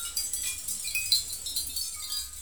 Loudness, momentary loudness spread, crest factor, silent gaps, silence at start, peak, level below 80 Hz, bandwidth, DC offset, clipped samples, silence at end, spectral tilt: -29 LUFS; 7 LU; 22 dB; none; 0 s; -10 dBFS; -54 dBFS; over 20 kHz; 0.3%; under 0.1%; 0 s; 2 dB/octave